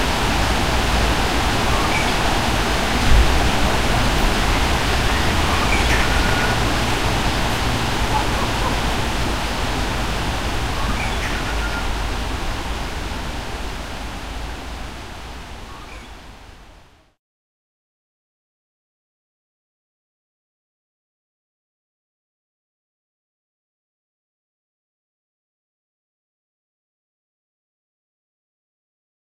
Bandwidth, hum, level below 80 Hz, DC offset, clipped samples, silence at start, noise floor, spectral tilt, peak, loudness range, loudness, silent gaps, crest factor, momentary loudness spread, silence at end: 16 kHz; none; -26 dBFS; 3%; under 0.1%; 0 s; -48 dBFS; -4 dB/octave; -2 dBFS; 15 LU; -20 LUFS; none; 20 dB; 14 LU; 12 s